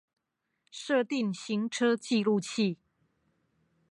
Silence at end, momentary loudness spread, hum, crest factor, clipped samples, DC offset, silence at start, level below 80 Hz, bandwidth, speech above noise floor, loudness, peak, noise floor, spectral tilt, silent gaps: 1.15 s; 12 LU; none; 16 dB; under 0.1%; under 0.1%; 0.75 s; -82 dBFS; 11.5 kHz; 53 dB; -30 LUFS; -16 dBFS; -82 dBFS; -5 dB/octave; none